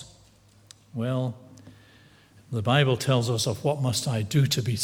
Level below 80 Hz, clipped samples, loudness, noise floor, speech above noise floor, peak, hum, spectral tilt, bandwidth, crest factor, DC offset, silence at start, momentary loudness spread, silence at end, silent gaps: -60 dBFS; under 0.1%; -25 LUFS; -56 dBFS; 32 dB; -6 dBFS; none; -5 dB/octave; 17 kHz; 20 dB; under 0.1%; 0 s; 12 LU; 0 s; none